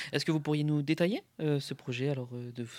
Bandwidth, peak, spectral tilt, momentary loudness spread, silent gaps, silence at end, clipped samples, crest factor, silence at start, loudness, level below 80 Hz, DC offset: 15.5 kHz; -16 dBFS; -6.5 dB/octave; 8 LU; none; 0 s; under 0.1%; 16 dB; 0 s; -32 LUFS; -78 dBFS; under 0.1%